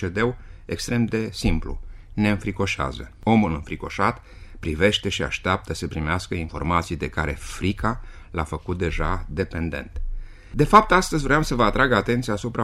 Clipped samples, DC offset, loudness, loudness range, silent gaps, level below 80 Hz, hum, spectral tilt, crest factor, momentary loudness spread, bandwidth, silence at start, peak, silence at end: under 0.1%; under 0.1%; -23 LUFS; 6 LU; none; -34 dBFS; none; -5.5 dB/octave; 22 dB; 14 LU; 15 kHz; 0 s; 0 dBFS; 0 s